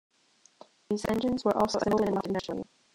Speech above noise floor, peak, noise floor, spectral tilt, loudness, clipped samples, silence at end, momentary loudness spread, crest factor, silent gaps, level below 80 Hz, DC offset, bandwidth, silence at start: 36 dB; -14 dBFS; -65 dBFS; -5.5 dB/octave; -29 LUFS; under 0.1%; 0.3 s; 9 LU; 18 dB; none; -58 dBFS; under 0.1%; 16 kHz; 0.9 s